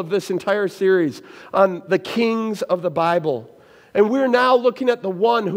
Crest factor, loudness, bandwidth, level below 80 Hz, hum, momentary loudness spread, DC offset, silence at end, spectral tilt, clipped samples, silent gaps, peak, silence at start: 18 dB; -19 LUFS; 16 kHz; -70 dBFS; none; 8 LU; under 0.1%; 0 s; -6 dB/octave; under 0.1%; none; -2 dBFS; 0 s